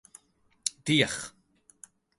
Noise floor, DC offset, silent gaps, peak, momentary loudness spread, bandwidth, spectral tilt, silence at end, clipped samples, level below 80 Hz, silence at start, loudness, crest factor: -67 dBFS; under 0.1%; none; -6 dBFS; 13 LU; 12 kHz; -3 dB/octave; 0.9 s; under 0.1%; -66 dBFS; 0.65 s; -28 LUFS; 26 dB